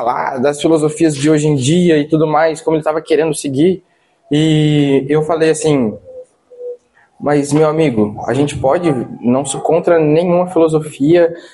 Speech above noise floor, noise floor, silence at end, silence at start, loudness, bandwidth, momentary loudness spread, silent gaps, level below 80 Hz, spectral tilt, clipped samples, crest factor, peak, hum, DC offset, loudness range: 27 dB; -39 dBFS; 0.05 s; 0 s; -13 LUFS; 11.5 kHz; 6 LU; none; -50 dBFS; -6 dB/octave; under 0.1%; 12 dB; 0 dBFS; none; under 0.1%; 3 LU